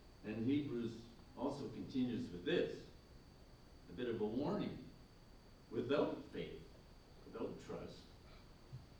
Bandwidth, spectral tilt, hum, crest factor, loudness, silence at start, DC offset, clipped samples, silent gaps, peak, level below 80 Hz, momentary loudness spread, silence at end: over 20 kHz; -7 dB/octave; none; 20 dB; -43 LUFS; 0 s; under 0.1%; under 0.1%; none; -24 dBFS; -64 dBFS; 23 LU; 0 s